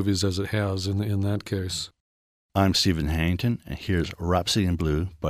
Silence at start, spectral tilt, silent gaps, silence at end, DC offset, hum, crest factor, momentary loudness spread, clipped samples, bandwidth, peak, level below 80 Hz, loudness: 0 s; -5 dB/octave; 2.00-2.49 s; 0 s; under 0.1%; none; 18 dB; 7 LU; under 0.1%; 15.5 kHz; -8 dBFS; -40 dBFS; -25 LUFS